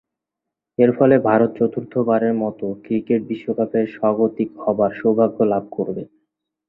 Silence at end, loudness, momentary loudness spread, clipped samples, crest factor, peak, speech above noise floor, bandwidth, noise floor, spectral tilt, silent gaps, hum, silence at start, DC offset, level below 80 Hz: 0.65 s; -19 LUFS; 10 LU; under 0.1%; 18 dB; -2 dBFS; 65 dB; 4.1 kHz; -84 dBFS; -11.5 dB/octave; none; none; 0.8 s; under 0.1%; -60 dBFS